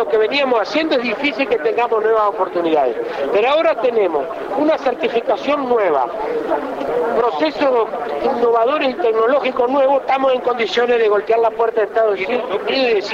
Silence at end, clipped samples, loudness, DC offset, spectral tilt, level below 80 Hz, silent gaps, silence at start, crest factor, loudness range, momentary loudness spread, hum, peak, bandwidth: 0 s; under 0.1%; -17 LUFS; under 0.1%; -4.5 dB/octave; -56 dBFS; none; 0 s; 10 dB; 2 LU; 5 LU; none; -6 dBFS; 7.4 kHz